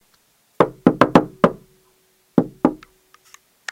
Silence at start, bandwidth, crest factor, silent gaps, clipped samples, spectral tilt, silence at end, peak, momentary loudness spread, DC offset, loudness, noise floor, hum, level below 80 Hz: 0.6 s; 15.5 kHz; 20 dB; none; 0.1%; -7 dB/octave; 0.95 s; 0 dBFS; 18 LU; under 0.1%; -19 LUFS; -60 dBFS; none; -50 dBFS